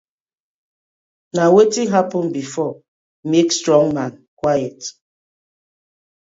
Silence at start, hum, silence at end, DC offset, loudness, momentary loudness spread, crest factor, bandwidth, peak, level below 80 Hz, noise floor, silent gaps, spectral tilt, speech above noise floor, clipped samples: 1.35 s; none; 1.4 s; under 0.1%; -17 LUFS; 15 LU; 18 dB; 8 kHz; 0 dBFS; -60 dBFS; under -90 dBFS; 2.88-3.23 s, 4.28-4.37 s; -5 dB/octave; over 74 dB; under 0.1%